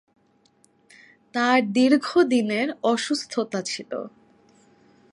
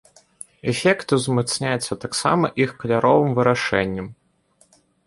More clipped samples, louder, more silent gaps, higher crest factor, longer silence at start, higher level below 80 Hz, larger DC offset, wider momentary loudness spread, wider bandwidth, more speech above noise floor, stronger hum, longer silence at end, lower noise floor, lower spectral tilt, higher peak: neither; second, -23 LUFS vs -20 LUFS; neither; about the same, 20 dB vs 18 dB; first, 1.35 s vs 0.65 s; second, -74 dBFS vs -54 dBFS; neither; about the same, 13 LU vs 12 LU; about the same, 11.5 kHz vs 11.5 kHz; about the same, 40 dB vs 40 dB; neither; about the same, 1.05 s vs 0.95 s; about the same, -62 dBFS vs -60 dBFS; about the same, -4 dB/octave vs -5 dB/octave; second, -6 dBFS vs -2 dBFS